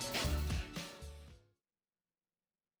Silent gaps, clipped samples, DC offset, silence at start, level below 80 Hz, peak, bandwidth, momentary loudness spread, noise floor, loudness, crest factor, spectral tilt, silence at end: none; under 0.1%; under 0.1%; 0 s; -46 dBFS; -24 dBFS; over 20 kHz; 20 LU; under -90 dBFS; -40 LUFS; 18 dB; -4 dB/octave; 1.4 s